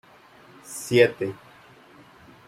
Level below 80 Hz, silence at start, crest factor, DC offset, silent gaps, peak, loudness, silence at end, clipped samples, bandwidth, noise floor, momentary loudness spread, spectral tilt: -68 dBFS; 0.7 s; 22 dB; under 0.1%; none; -4 dBFS; -23 LUFS; 1.15 s; under 0.1%; 16 kHz; -52 dBFS; 19 LU; -4.5 dB/octave